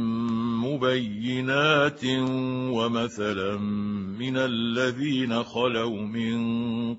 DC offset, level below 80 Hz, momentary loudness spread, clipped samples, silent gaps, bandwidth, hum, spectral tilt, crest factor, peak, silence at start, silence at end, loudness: under 0.1%; -62 dBFS; 6 LU; under 0.1%; none; 8 kHz; none; -6 dB/octave; 18 dB; -6 dBFS; 0 s; 0 s; -26 LUFS